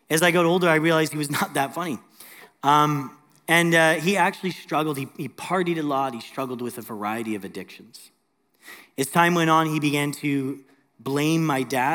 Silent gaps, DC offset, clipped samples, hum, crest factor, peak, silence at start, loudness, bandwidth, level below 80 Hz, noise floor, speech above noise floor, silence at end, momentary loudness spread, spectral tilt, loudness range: none; under 0.1%; under 0.1%; none; 20 dB; -4 dBFS; 0.1 s; -22 LUFS; 18.5 kHz; -74 dBFS; -67 dBFS; 44 dB; 0 s; 15 LU; -4.5 dB/octave; 7 LU